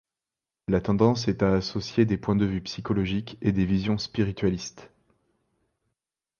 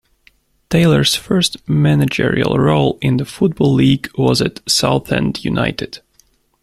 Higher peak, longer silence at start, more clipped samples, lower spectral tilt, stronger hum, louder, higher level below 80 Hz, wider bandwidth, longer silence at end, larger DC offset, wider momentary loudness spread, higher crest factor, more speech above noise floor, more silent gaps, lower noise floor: second, -6 dBFS vs 0 dBFS; about the same, 0.7 s vs 0.7 s; neither; first, -7 dB/octave vs -5.5 dB/octave; neither; second, -26 LUFS vs -15 LUFS; second, -48 dBFS vs -42 dBFS; second, 7 kHz vs 14.5 kHz; first, 1.55 s vs 0.65 s; neither; about the same, 7 LU vs 6 LU; about the same, 20 dB vs 16 dB; first, 65 dB vs 41 dB; neither; first, -90 dBFS vs -56 dBFS